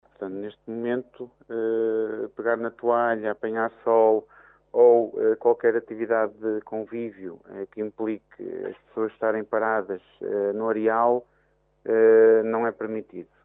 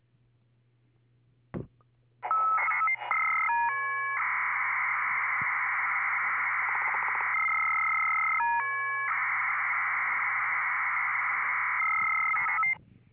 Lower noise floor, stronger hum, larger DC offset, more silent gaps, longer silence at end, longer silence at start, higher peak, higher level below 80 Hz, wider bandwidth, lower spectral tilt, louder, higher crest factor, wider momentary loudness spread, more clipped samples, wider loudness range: about the same, -66 dBFS vs -67 dBFS; neither; neither; neither; second, 0.2 s vs 0.35 s; second, 0.2 s vs 1.55 s; first, -8 dBFS vs -16 dBFS; about the same, -72 dBFS vs -72 dBFS; about the same, 3.7 kHz vs 4 kHz; first, -10 dB/octave vs -1 dB/octave; first, -24 LUFS vs -27 LUFS; about the same, 18 dB vs 14 dB; first, 17 LU vs 3 LU; neither; first, 7 LU vs 2 LU